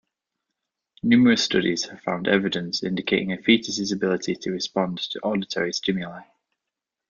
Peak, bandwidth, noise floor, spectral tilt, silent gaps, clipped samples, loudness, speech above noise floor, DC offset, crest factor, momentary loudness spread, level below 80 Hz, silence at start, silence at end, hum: -2 dBFS; 7.4 kHz; -86 dBFS; -4.5 dB/octave; none; under 0.1%; -23 LUFS; 63 dB; under 0.1%; 22 dB; 9 LU; -62 dBFS; 1.05 s; 0.85 s; none